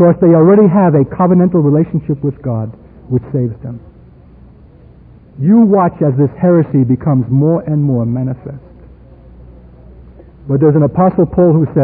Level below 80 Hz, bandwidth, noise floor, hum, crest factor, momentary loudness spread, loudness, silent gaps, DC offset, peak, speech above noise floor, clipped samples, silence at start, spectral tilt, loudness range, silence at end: -40 dBFS; 2.9 kHz; -40 dBFS; none; 12 dB; 12 LU; -12 LUFS; none; under 0.1%; 0 dBFS; 29 dB; under 0.1%; 0 s; -16.5 dB/octave; 8 LU; 0 s